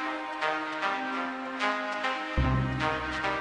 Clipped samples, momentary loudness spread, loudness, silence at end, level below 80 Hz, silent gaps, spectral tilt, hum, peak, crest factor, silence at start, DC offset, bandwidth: under 0.1%; 4 LU; -30 LUFS; 0 s; -40 dBFS; none; -5.5 dB/octave; none; -14 dBFS; 16 dB; 0 s; under 0.1%; 10.5 kHz